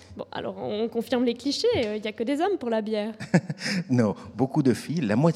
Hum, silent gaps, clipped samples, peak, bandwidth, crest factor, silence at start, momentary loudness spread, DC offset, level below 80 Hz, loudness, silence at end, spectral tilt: none; none; under 0.1%; -4 dBFS; 15 kHz; 20 dB; 0.1 s; 6 LU; under 0.1%; -62 dBFS; -26 LUFS; 0 s; -6.5 dB/octave